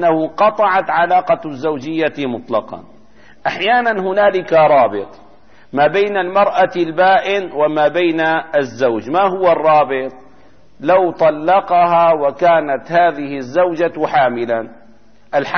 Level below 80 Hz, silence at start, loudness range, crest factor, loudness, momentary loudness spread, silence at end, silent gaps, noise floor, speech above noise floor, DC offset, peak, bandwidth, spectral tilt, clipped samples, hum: -58 dBFS; 0 s; 3 LU; 12 dB; -15 LUFS; 9 LU; 0 s; none; -49 dBFS; 35 dB; 0.8%; -2 dBFS; 6.6 kHz; -6 dB/octave; under 0.1%; none